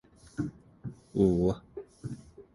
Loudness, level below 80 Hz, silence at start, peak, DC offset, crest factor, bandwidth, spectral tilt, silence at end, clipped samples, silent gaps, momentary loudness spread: -30 LUFS; -50 dBFS; 0.4 s; -12 dBFS; under 0.1%; 20 dB; 11.5 kHz; -9 dB/octave; 0.15 s; under 0.1%; none; 20 LU